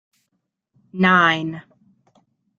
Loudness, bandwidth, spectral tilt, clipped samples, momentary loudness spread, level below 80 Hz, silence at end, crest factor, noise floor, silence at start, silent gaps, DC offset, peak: -17 LUFS; 7 kHz; -6 dB/octave; under 0.1%; 23 LU; -66 dBFS; 1 s; 22 dB; -75 dBFS; 0.95 s; none; under 0.1%; -2 dBFS